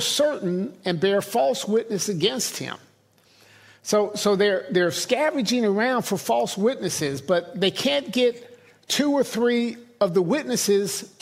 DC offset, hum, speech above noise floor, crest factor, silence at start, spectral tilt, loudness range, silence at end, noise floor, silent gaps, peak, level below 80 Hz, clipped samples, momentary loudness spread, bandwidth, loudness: under 0.1%; none; 36 dB; 18 dB; 0 s; -3.5 dB/octave; 3 LU; 0.15 s; -59 dBFS; none; -6 dBFS; -68 dBFS; under 0.1%; 6 LU; 16 kHz; -23 LUFS